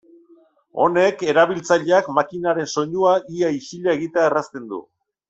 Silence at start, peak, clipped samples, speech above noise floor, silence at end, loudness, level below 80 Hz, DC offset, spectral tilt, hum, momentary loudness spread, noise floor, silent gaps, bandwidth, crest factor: 0.75 s; -2 dBFS; under 0.1%; 35 dB; 0.45 s; -19 LUFS; -64 dBFS; under 0.1%; -5 dB/octave; none; 12 LU; -54 dBFS; none; 8 kHz; 18 dB